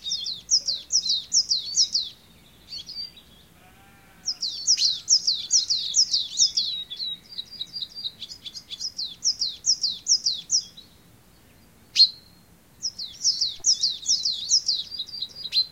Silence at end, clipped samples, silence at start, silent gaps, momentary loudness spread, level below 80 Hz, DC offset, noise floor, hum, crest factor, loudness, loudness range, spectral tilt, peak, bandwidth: 0 s; under 0.1%; 0 s; none; 15 LU; -62 dBFS; under 0.1%; -55 dBFS; none; 22 dB; -22 LUFS; 6 LU; 2.5 dB/octave; -6 dBFS; 16.5 kHz